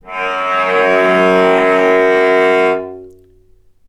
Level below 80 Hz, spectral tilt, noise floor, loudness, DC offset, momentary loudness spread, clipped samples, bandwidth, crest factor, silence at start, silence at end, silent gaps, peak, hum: -54 dBFS; -5.5 dB/octave; -48 dBFS; -12 LUFS; under 0.1%; 7 LU; under 0.1%; 11.5 kHz; 12 dB; 0.05 s; 0.8 s; none; 0 dBFS; none